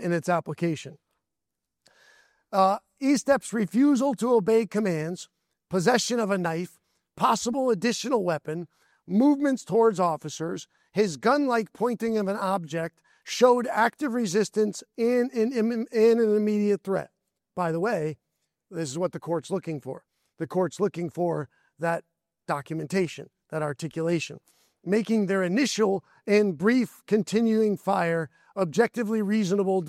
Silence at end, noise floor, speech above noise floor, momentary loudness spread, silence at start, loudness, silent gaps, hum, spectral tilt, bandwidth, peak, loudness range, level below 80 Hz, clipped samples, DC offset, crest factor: 0 s; -86 dBFS; 61 dB; 12 LU; 0 s; -26 LUFS; none; none; -5.5 dB/octave; 15 kHz; -8 dBFS; 6 LU; -72 dBFS; under 0.1%; under 0.1%; 18 dB